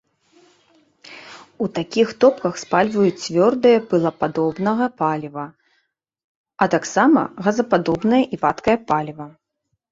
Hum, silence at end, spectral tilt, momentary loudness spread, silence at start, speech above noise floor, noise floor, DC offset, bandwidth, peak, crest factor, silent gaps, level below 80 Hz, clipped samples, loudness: none; 0.65 s; -6 dB/octave; 16 LU; 1.1 s; 56 dB; -75 dBFS; under 0.1%; 7.8 kHz; -2 dBFS; 18 dB; 6.24-6.44 s; -58 dBFS; under 0.1%; -19 LUFS